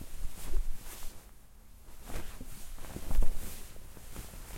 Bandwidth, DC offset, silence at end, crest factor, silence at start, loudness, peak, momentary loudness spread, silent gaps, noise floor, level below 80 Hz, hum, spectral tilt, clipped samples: 16 kHz; under 0.1%; 0 s; 18 dB; 0 s; -44 LUFS; -12 dBFS; 19 LU; none; -52 dBFS; -36 dBFS; none; -4.5 dB/octave; under 0.1%